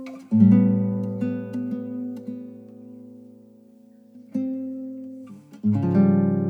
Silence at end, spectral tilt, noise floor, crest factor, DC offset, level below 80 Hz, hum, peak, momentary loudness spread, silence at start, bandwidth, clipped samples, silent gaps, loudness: 0 s; -11 dB/octave; -51 dBFS; 18 dB; under 0.1%; -74 dBFS; none; -4 dBFS; 26 LU; 0 s; 3 kHz; under 0.1%; none; -23 LUFS